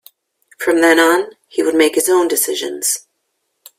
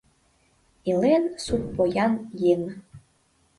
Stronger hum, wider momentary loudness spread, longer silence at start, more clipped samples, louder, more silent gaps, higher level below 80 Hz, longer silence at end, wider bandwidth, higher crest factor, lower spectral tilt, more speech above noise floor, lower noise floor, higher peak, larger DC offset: neither; about the same, 10 LU vs 12 LU; second, 0.6 s vs 0.85 s; neither; first, -15 LUFS vs -24 LUFS; neither; second, -64 dBFS vs -52 dBFS; first, 0.8 s vs 0.6 s; first, 16 kHz vs 11.5 kHz; about the same, 16 dB vs 16 dB; second, -1 dB/octave vs -6.5 dB/octave; first, 55 dB vs 42 dB; first, -70 dBFS vs -65 dBFS; first, 0 dBFS vs -10 dBFS; neither